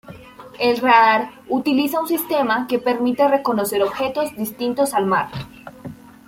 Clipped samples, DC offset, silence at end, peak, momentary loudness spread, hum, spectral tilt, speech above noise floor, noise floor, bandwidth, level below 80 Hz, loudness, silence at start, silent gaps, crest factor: under 0.1%; under 0.1%; 0.35 s; -2 dBFS; 17 LU; none; -4.5 dB/octave; 21 dB; -40 dBFS; 17 kHz; -56 dBFS; -19 LUFS; 0.05 s; none; 18 dB